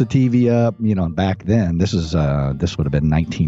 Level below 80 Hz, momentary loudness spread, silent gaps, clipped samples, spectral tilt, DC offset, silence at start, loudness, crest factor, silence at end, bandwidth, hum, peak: -32 dBFS; 5 LU; none; under 0.1%; -7.5 dB/octave; under 0.1%; 0 s; -18 LUFS; 12 dB; 0 s; 7.8 kHz; none; -4 dBFS